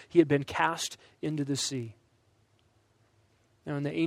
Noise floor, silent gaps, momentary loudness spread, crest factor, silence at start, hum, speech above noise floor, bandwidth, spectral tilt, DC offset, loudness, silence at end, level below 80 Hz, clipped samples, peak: -68 dBFS; none; 14 LU; 22 dB; 0 s; none; 39 dB; 15 kHz; -4.5 dB/octave; under 0.1%; -30 LUFS; 0 s; -68 dBFS; under 0.1%; -10 dBFS